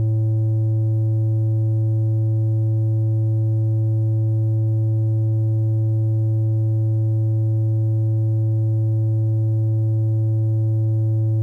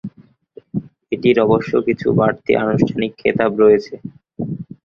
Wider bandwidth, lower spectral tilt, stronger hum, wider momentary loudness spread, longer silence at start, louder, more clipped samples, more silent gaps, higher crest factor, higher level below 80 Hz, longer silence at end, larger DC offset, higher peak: second, 1.1 kHz vs 7 kHz; first, -13 dB/octave vs -8.5 dB/octave; neither; second, 0 LU vs 15 LU; about the same, 0 s vs 0.05 s; second, -20 LUFS vs -17 LUFS; neither; neither; second, 2 dB vs 16 dB; second, -60 dBFS vs -50 dBFS; second, 0 s vs 0.2 s; neither; second, -16 dBFS vs -2 dBFS